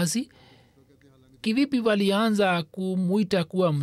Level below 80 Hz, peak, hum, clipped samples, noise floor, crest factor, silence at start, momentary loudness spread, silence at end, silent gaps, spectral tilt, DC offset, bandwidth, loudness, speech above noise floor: -66 dBFS; -12 dBFS; none; under 0.1%; -57 dBFS; 12 dB; 0 s; 8 LU; 0 s; none; -5.5 dB/octave; under 0.1%; 14.5 kHz; -24 LUFS; 33 dB